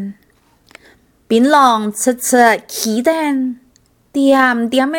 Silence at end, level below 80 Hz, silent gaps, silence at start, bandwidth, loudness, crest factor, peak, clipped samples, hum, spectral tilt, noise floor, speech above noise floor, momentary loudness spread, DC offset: 0 s; -60 dBFS; none; 0 s; 19 kHz; -13 LUFS; 14 dB; 0 dBFS; under 0.1%; none; -3 dB/octave; -54 dBFS; 41 dB; 12 LU; under 0.1%